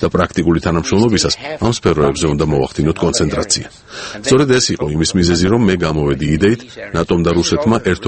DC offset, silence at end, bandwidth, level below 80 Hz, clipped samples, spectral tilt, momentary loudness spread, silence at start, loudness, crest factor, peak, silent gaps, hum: under 0.1%; 0 s; 8.8 kHz; -32 dBFS; under 0.1%; -5 dB/octave; 5 LU; 0 s; -15 LUFS; 14 dB; 0 dBFS; none; none